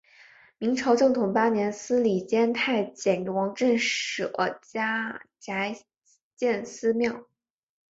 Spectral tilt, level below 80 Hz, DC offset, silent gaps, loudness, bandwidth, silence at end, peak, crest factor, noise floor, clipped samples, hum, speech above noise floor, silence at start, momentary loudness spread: -4.5 dB/octave; -70 dBFS; under 0.1%; 6.22-6.31 s; -26 LUFS; 8 kHz; 0.7 s; -10 dBFS; 18 dB; -55 dBFS; under 0.1%; none; 29 dB; 0.6 s; 8 LU